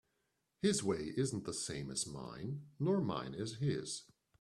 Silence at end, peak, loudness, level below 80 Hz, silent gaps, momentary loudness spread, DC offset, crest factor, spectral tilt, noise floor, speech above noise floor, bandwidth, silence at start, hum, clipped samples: 0.4 s; -20 dBFS; -39 LUFS; -68 dBFS; none; 10 LU; under 0.1%; 18 dB; -5 dB/octave; -83 dBFS; 45 dB; 13 kHz; 0.65 s; none; under 0.1%